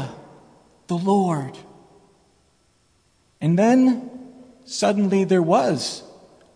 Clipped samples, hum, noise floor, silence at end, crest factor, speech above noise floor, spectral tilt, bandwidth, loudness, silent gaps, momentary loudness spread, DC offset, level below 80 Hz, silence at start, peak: under 0.1%; none; -62 dBFS; 0.5 s; 16 dB; 43 dB; -6 dB/octave; 10.5 kHz; -20 LUFS; none; 19 LU; under 0.1%; -66 dBFS; 0 s; -6 dBFS